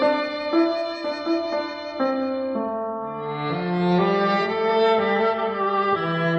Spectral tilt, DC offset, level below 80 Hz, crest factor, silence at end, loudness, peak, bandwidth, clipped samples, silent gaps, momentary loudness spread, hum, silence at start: -7.5 dB/octave; under 0.1%; -62 dBFS; 14 dB; 0 s; -23 LUFS; -8 dBFS; 8 kHz; under 0.1%; none; 8 LU; none; 0 s